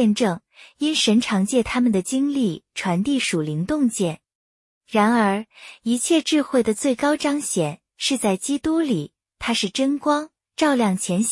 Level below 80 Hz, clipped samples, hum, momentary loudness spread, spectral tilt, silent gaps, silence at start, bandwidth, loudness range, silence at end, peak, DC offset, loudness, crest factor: -56 dBFS; under 0.1%; none; 8 LU; -4.5 dB/octave; 4.35-4.81 s; 0 s; 12 kHz; 2 LU; 0 s; -6 dBFS; under 0.1%; -21 LUFS; 16 dB